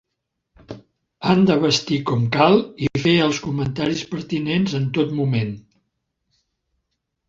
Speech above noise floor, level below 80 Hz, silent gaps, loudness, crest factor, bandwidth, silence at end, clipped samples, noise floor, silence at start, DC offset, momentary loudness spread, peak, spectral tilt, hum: 59 dB; -52 dBFS; none; -20 LUFS; 20 dB; 7.8 kHz; 1.7 s; under 0.1%; -78 dBFS; 0.7 s; under 0.1%; 13 LU; -2 dBFS; -6 dB/octave; none